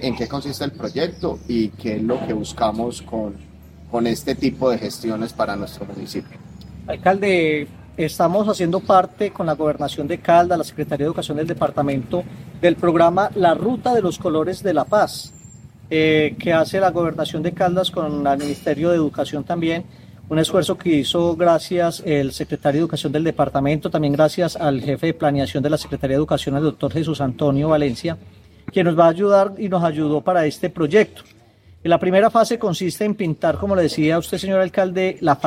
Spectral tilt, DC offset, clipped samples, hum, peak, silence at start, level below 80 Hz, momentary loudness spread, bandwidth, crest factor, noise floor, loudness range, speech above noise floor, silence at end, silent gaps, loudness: -6 dB/octave; under 0.1%; under 0.1%; none; -2 dBFS; 0 s; -48 dBFS; 10 LU; 16 kHz; 18 dB; -42 dBFS; 5 LU; 23 dB; 0 s; none; -19 LUFS